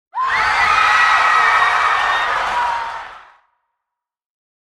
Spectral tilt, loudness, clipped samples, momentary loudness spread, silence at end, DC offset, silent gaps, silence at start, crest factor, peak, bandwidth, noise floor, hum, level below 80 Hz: -0.5 dB/octave; -14 LUFS; under 0.1%; 9 LU; 1.45 s; under 0.1%; none; 0.15 s; 16 dB; -2 dBFS; 13 kHz; -82 dBFS; none; -48 dBFS